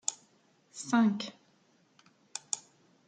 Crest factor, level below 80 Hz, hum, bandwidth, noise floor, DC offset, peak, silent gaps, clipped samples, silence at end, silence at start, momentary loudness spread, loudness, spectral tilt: 24 dB; -86 dBFS; none; 9.6 kHz; -68 dBFS; under 0.1%; -12 dBFS; none; under 0.1%; 0.5 s; 0.1 s; 19 LU; -33 LUFS; -3.5 dB/octave